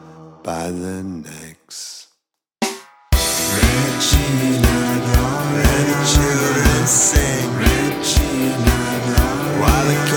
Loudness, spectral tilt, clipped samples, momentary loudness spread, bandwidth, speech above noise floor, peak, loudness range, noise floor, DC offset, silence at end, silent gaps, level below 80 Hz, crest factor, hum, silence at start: -17 LUFS; -4 dB/octave; under 0.1%; 16 LU; over 20 kHz; 45 dB; 0 dBFS; 6 LU; -70 dBFS; under 0.1%; 0 s; none; -24 dBFS; 16 dB; none; 0.05 s